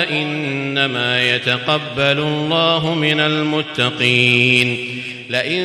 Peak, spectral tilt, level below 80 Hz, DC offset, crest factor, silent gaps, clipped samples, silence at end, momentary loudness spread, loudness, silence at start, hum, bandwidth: -2 dBFS; -5 dB/octave; -56 dBFS; under 0.1%; 16 dB; none; under 0.1%; 0 s; 9 LU; -16 LUFS; 0 s; none; 14 kHz